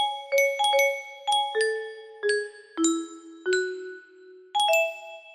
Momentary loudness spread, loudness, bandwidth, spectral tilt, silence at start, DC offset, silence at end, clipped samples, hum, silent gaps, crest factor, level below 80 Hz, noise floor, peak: 17 LU; -25 LUFS; 15.5 kHz; 0.5 dB/octave; 0 s; under 0.1%; 0 s; under 0.1%; none; none; 16 dB; -76 dBFS; -50 dBFS; -10 dBFS